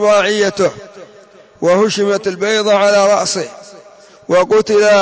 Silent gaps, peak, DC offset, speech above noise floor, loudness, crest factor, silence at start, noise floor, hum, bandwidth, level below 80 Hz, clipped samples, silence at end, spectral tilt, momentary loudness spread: none; -2 dBFS; under 0.1%; 30 dB; -13 LUFS; 12 dB; 0 s; -42 dBFS; none; 8 kHz; -58 dBFS; under 0.1%; 0 s; -3.5 dB/octave; 8 LU